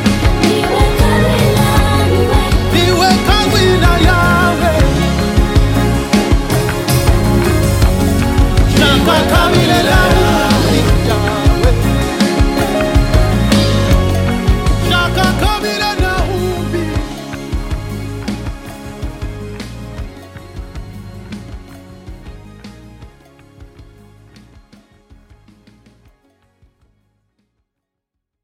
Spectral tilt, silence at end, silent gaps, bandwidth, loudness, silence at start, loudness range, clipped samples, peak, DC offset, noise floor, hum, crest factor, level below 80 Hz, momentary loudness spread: -5.5 dB/octave; 4.6 s; none; 17 kHz; -12 LUFS; 0 s; 18 LU; under 0.1%; 0 dBFS; under 0.1%; -77 dBFS; none; 14 dB; -18 dBFS; 18 LU